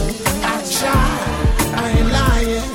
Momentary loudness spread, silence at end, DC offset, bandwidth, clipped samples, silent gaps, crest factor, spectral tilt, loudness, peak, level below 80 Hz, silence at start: 3 LU; 0 s; under 0.1%; 16.5 kHz; under 0.1%; none; 12 dB; -4.5 dB/octave; -17 LUFS; -4 dBFS; -20 dBFS; 0 s